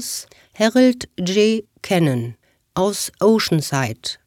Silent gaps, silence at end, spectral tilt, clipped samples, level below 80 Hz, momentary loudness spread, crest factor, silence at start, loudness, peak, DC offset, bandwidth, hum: none; 0.15 s; -5 dB/octave; under 0.1%; -56 dBFS; 11 LU; 18 dB; 0 s; -19 LUFS; -2 dBFS; under 0.1%; 18 kHz; none